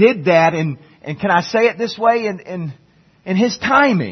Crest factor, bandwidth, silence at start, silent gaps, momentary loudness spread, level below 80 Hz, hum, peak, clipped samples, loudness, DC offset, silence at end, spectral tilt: 16 dB; 6.4 kHz; 0 s; none; 16 LU; -58 dBFS; none; 0 dBFS; under 0.1%; -16 LUFS; under 0.1%; 0 s; -6 dB/octave